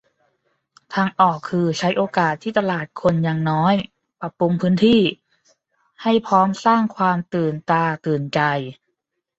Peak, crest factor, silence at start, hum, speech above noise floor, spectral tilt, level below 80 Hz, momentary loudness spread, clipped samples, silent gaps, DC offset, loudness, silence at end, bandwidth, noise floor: -2 dBFS; 18 dB; 0.9 s; none; 57 dB; -6.5 dB/octave; -58 dBFS; 7 LU; under 0.1%; none; under 0.1%; -19 LUFS; 0.65 s; 8 kHz; -76 dBFS